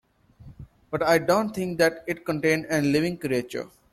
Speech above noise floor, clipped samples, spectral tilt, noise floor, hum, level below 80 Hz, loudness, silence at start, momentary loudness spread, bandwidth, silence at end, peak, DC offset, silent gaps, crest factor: 25 dB; under 0.1%; -5.5 dB/octave; -49 dBFS; none; -56 dBFS; -24 LUFS; 0.4 s; 10 LU; 15.5 kHz; 0.25 s; -8 dBFS; under 0.1%; none; 18 dB